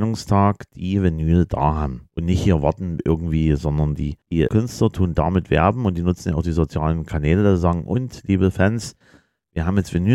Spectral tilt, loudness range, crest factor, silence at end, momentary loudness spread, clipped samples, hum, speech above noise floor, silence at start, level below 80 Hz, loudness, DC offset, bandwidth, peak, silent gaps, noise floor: -7.5 dB/octave; 1 LU; 16 dB; 0 s; 7 LU; under 0.1%; none; 36 dB; 0 s; -32 dBFS; -20 LUFS; under 0.1%; 12.5 kHz; -2 dBFS; none; -55 dBFS